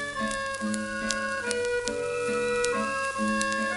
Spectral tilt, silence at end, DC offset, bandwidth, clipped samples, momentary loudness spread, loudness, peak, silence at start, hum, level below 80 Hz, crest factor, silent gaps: -3 dB/octave; 0 s; under 0.1%; 12 kHz; under 0.1%; 4 LU; -28 LUFS; -2 dBFS; 0 s; none; -54 dBFS; 26 dB; none